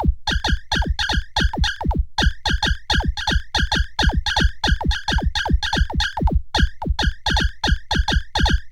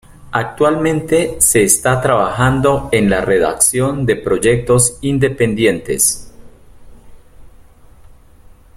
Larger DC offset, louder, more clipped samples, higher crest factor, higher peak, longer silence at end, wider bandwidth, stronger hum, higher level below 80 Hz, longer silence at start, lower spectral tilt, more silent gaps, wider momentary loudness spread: neither; second, -21 LUFS vs -14 LUFS; neither; about the same, 14 dB vs 16 dB; second, -6 dBFS vs 0 dBFS; second, 0 s vs 0.65 s; second, 12 kHz vs 16 kHz; neither; first, -22 dBFS vs -38 dBFS; second, 0 s vs 0.2 s; about the same, -4 dB/octave vs -4 dB/octave; neither; second, 2 LU vs 5 LU